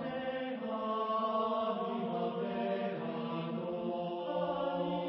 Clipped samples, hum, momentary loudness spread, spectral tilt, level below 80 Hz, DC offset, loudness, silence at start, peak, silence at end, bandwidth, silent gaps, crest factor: under 0.1%; none; 5 LU; -5 dB/octave; -74 dBFS; under 0.1%; -36 LUFS; 0 s; -22 dBFS; 0 s; 5.6 kHz; none; 14 dB